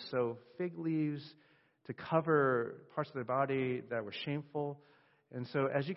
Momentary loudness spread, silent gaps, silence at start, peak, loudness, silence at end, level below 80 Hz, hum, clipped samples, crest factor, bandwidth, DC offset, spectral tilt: 15 LU; none; 0 s; -16 dBFS; -36 LUFS; 0 s; -78 dBFS; none; under 0.1%; 20 dB; 5.8 kHz; under 0.1%; -5.5 dB/octave